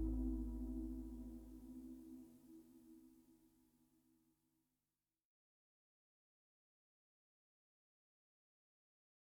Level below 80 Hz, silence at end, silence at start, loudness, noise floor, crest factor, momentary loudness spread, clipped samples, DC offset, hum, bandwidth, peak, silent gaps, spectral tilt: -56 dBFS; 5.9 s; 0 s; -50 LUFS; under -90 dBFS; 20 dB; 20 LU; under 0.1%; under 0.1%; 50 Hz at -90 dBFS; 19 kHz; -32 dBFS; none; -9.5 dB/octave